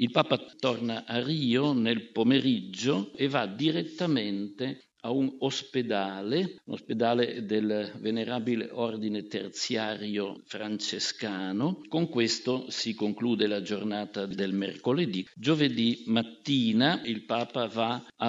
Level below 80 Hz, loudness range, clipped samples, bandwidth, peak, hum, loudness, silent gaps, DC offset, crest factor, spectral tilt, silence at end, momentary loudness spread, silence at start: -78 dBFS; 4 LU; under 0.1%; 8 kHz; -6 dBFS; none; -29 LUFS; none; under 0.1%; 22 dB; -5 dB/octave; 0 s; 8 LU; 0 s